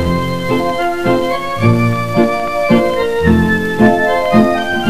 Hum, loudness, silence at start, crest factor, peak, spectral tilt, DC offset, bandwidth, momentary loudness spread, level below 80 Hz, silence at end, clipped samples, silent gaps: none; -13 LUFS; 0 s; 14 dB; 0 dBFS; -7 dB/octave; 4%; 16 kHz; 5 LU; -34 dBFS; 0 s; under 0.1%; none